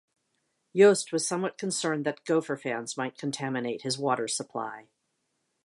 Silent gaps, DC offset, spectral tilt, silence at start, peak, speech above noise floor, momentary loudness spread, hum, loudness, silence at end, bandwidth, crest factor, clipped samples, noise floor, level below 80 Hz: none; under 0.1%; -4 dB/octave; 0.75 s; -8 dBFS; 50 dB; 13 LU; none; -28 LUFS; 0.85 s; 11.5 kHz; 22 dB; under 0.1%; -78 dBFS; -80 dBFS